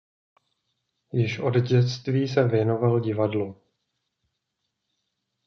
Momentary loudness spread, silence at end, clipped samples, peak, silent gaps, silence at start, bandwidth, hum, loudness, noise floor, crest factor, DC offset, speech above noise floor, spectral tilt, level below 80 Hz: 7 LU; 1.95 s; under 0.1%; -8 dBFS; none; 1.15 s; 6.4 kHz; none; -24 LUFS; -80 dBFS; 18 dB; under 0.1%; 57 dB; -8 dB/octave; -68 dBFS